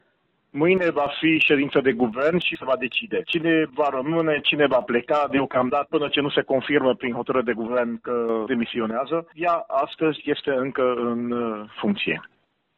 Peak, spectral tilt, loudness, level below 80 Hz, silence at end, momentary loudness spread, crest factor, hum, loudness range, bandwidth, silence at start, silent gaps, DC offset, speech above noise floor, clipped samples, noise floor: -6 dBFS; -7.5 dB/octave; -23 LUFS; -62 dBFS; 0.5 s; 7 LU; 16 dB; none; 3 LU; 7.4 kHz; 0.55 s; none; under 0.1%; 45 dB; under 0.1%; -68 dBFS